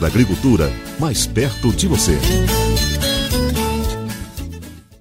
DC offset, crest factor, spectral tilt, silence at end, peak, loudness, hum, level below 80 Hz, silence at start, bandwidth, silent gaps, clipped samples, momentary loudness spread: under 0.1%; 16 dB; -4.5 dB/octave; 0.2 s; 0 dBFS; -17 LUFS; none; -24 dBFS; 0 s; 16.5 kHz; none; under 0.1%; 14 LU